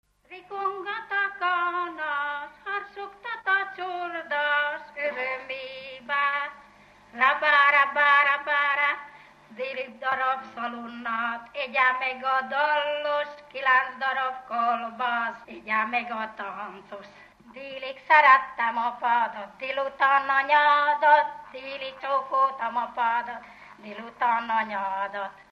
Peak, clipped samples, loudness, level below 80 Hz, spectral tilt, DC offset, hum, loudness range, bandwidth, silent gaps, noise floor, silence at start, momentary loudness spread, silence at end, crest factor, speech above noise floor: -6 dBFS; under 0.1%; -25 LUFS; -70 dBFS; -3.5 dB/octave; under 0.1%; 50 Hz at -70 dBFS; 7 LU; 7.2 kHz; none; -54 dBFS; 0.3 s; 17 LU; 0.2 s; 20 dB; 29 dB